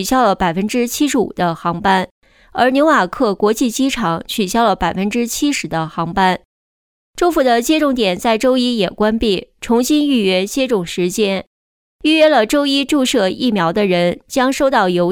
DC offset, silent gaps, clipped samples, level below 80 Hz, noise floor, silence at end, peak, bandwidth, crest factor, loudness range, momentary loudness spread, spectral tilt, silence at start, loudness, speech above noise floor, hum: under 0.1%; 2.11-2.22 s, 6.45-7.13 s, 11.47-11.99 s; under 0.1%; -42 dBFS; under -90 dBFS; 0 s; -2 dBFS; 20 kHz; 12 dB; 2 LU; 6 LU; -4.5 dB/octave; 0 s; -15 LUFS; over 75 dB; none